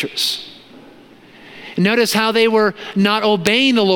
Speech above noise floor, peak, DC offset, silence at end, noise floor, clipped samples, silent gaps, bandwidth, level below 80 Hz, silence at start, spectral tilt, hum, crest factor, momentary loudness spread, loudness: 28 dB; 0 dBFS; under 0.1%; 0 s; -43 dBFS; under 0.1%; none; 17 kHz; -60 dBFS; 0 s; -4 dB/octave; none; 16 dB; 14 LU; -15 LUFS